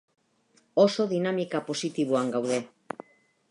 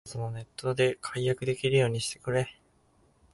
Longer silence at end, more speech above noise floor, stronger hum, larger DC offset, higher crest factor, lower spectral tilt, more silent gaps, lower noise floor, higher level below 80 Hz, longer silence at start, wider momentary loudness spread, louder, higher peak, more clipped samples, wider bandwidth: about the same, 0.85 s vs 0.8 s; first, 40 dB vs 36 dB; neither; neither; about the same, 20 dB vs 18 dB; about the same, -5.5 dB/octave vs -5 dB/octave; neither; about the same, -66 dBFS vs -65 dBFS; second, -80 dBFS vs -60 dBFS; first, 0.75 s vs 0.05 s; first, 18 LU vs 11 LU; about the same, -27 LUFS vs -29 LUFS; first, -8 dBFS vs -12 dBFS; neither; about the same, 11.5 kHz vs 11.5 kHz